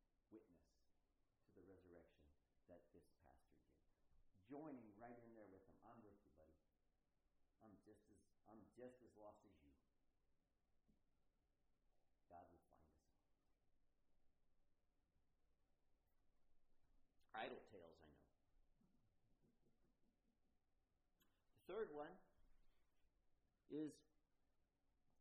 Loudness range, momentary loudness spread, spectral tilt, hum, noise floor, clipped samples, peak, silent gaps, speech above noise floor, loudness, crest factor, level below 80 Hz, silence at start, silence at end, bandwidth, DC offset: 11 LU; 15 LU; -2.5 dB/octave; none; -87 dBFS; under 0.1%; -40 dBFS; none; 27 dB; -59 LUFS; 26 dB; -84 dBFS; 0 s; 0 s; 3.5 kHz; under 0.1%